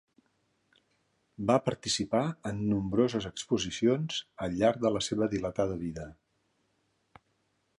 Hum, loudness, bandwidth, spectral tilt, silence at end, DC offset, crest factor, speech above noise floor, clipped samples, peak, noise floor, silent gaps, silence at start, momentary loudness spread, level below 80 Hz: none; -30 LUFS; 11.5 kHz; -5 dB/octave; 1.7 s; under 0.1%; 22 dB; 45 dB; under 0.1%; -10 dBFS; -75 dBFS; none; 1.4 s; 8 LU; -58 dBFS